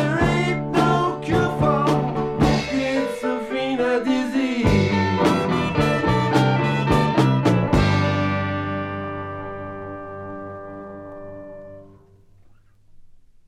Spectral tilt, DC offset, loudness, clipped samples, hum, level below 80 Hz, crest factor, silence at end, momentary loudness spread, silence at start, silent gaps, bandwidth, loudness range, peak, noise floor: -7 dB/octave; under 0.1%; -20 LUFS; under 0.1%; none; -38 dBFS; 16 dB; 0.35 s; 16 LU; 0 s; none; 14 kHz; 16 LU; -4 dBFS; -51 dBFS